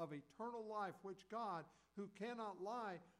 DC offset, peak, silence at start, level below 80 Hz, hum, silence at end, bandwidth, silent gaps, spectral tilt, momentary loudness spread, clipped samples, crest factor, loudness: under 0.1%; -36 dBFS; 0 s; -88 dBFS; none; 0.1 s; 13 kHz; none; -6 dB/octave; 7 LU; under 0.1%; 14 dB; -50 LUFS